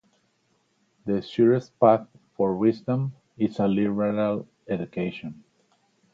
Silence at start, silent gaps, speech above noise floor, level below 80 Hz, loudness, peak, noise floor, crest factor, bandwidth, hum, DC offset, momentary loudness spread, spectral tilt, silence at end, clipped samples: 1.05 s; none; 45 dB; -62 dBFS; -25 LUFS; -4 dBFS; -69 dBFS; 22 dB; 7.4 kHz; none; under 0.1%; 12 LU; -9 dB/octave; 0.8 s; under 0.1%